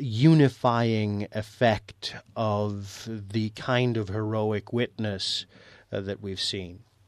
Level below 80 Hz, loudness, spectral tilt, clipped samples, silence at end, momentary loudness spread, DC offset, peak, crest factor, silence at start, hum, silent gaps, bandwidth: -60 dBFS; -27 LUFS; -6.5 dB/octave; under 0.1%; 0.3 s; 15 LU; under 0.1%; -8 dBFS; 18 dB; 0 s; none; none; 12.5 kHz